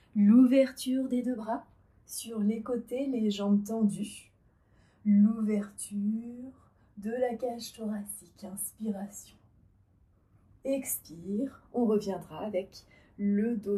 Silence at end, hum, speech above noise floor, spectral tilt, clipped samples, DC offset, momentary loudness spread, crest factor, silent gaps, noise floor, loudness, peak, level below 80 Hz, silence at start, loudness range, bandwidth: 0 s; none; 34 dB; -6 dB/octave; under 0.1%; under 0.1%; 17 LU; 18 dB; none; -65 dBFS; -30 LUFS; -12 dBFS; -68 dBFS; 0.15 s; 8 LU; 14 kHz